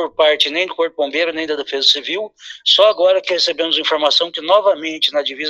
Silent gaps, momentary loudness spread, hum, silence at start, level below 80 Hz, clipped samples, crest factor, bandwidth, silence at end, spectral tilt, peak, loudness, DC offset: none; 9 LU; none; 0 s; -66 dBFS; under 0.1%; 16 dB; 12 kHz; 0 s; -1 dB/octave; 0 dBFS; -15 LUFS; under 0.1%